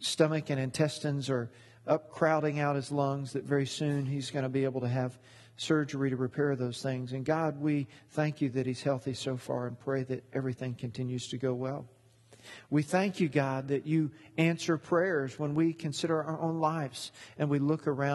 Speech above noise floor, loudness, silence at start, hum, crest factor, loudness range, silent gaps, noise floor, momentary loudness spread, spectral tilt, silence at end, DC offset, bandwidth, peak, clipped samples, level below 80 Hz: 28 dB; -32 LUFS; 0 s; none; 20 dB; 4 LU; none; -60 dBFS; 7 LU; -6 dB/octave; 0 s; under 0.1%; 12.5 kHz; -12 dBFS; under 0.1%; -70 dBFS